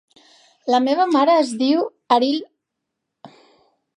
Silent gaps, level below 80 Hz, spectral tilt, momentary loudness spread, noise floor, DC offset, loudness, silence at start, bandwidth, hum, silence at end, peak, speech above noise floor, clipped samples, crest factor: none; -80 dBFS; -3.5 dB/octave; 7 LU; -80 dBFS; under 0.1%; -18 LUFS; 0.65 s; 11 kHz; none; 0.7 s; -2 dBFS; 62 dB; under 0.1%; 18 dB